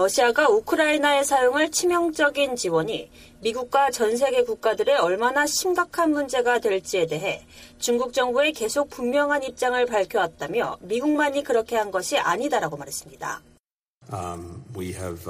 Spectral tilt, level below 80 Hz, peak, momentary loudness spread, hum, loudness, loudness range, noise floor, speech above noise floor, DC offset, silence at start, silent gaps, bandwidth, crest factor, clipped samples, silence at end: -3 dB/octave; -56 dBFS; -6 dBFS; 13 LU; none; -23 LUFS; 4 LU; -64 dBFS; 41 dB; under 0.1%; 0 s; 13.60-13.64 s, 13.71-14.01 s; 15.5 kHz; 16 dB; under 0.1%; 0 s